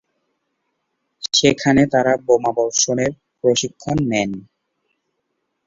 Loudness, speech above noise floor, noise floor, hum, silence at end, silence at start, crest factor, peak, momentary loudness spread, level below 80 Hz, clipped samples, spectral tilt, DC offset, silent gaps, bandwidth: -18 LUFS; 56 dB; -73 dBFS; none; 1.25 s; 1.2 s; 18 dB; -2 dBFS; 9 LU; -50 dBFS; under 0.1%; -3.5 dB/octave; under 0.1%; none; 8 kHz